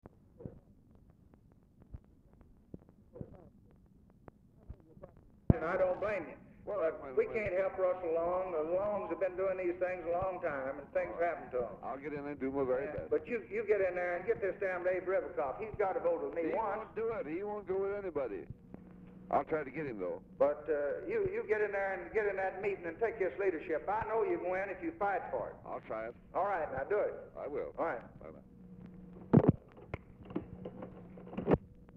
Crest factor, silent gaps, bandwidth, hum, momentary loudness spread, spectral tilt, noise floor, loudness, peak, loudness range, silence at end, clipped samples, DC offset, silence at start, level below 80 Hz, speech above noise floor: 28 dB; none; 6.4 kHz; none; 19 LU; -10 dB/octave; -63 dBFS; -36 LUFS; -8 dBFS; 4 LU; 0 s; under 0.1%; under 0.1%; 0.4 s; -58 dBFS; 28 dB